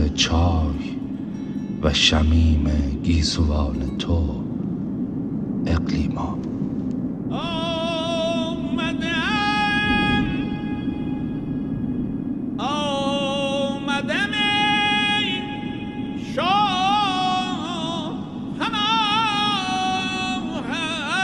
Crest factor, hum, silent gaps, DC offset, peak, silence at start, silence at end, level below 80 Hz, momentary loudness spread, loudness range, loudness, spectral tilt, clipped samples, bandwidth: 18 dB; none; none; under 0.1%; -4 dBFS; 0 s; 0 s; -32 dBFS; 9 LU; 4 LU; -22 LUFS; -5 dB/octave; under 0.1%; 10.5 kHz